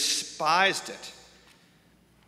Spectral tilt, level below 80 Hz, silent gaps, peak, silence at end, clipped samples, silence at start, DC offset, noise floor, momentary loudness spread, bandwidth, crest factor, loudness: -0.5 dB/octave; -70 dBFS; none; -8 dBFS; 1.15 s; under 0.1%; 0 s; under 0.1%; -61 dBFS; 19 LU; 16 kHz; 22 dB; -25 LUFS